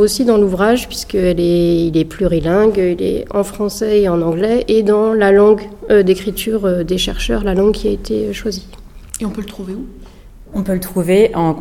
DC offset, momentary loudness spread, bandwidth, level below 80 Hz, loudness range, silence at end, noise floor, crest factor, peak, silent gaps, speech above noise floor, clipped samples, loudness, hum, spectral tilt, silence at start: 0.2%; 12 LU; 16.5 kHz; -32 dBFS; 7 LU; 0 s; -37 dBFS; 14 dB; 0 dBFS; none; 23 dB; under 0.1%; -15 LUFS; none; -6 dB/octave; 0 s